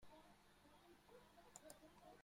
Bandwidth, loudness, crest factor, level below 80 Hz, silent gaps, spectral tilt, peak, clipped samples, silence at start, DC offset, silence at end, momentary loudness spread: 16 kHz; -66 LUFS; 28 dB; -80 dBFS; none; -3 dB/octave; -40 dBFS; under 0.1%; 0 s; under 0.1%; 0 s; 6 LU